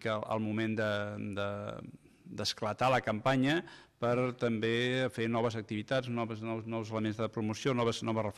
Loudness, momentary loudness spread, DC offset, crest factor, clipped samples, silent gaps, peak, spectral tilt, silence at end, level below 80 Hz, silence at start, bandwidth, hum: -33 LUFS; 9 LU; under 0.1%; 14 dB; under 0.1%; none; -18 dBFS; -5.5 dB/octave; 0 s; -68 dBFS; 0 s; 14 kHz; none